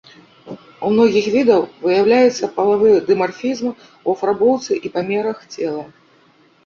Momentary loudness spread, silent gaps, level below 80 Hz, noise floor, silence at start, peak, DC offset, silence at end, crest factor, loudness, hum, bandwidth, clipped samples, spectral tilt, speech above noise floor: 12 LU; none; -60 dBFS; -53 dBFS; 0.45 s; -2 dBFS; under 0.1%; 0.8 s; 16 dB; -17 LUFS; none; 7.4 kHz; under 0.1%; -5.5 dB/octave; 37 dB